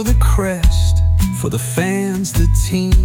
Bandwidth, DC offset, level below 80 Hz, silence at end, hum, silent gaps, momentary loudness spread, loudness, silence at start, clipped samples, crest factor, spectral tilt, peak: 17.5 kHz; under 0.1%; -16 dBFS; 0 s; none; none; 4 LU; -16 LUFS; 0 s; under 0.1%; 10 dB; -5.5 dB/octave; -2 dBFS